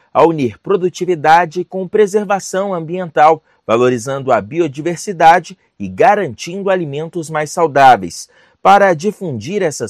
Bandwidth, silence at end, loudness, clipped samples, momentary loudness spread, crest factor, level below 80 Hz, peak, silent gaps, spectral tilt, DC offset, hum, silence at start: 14 kHz; 0 s; -14 LUFS; 0.6%; 12 LU; 14 dB; -58 dBFS; 0 dBFS; none; -5 dB/octave; under 0.1%; none; 0.15 s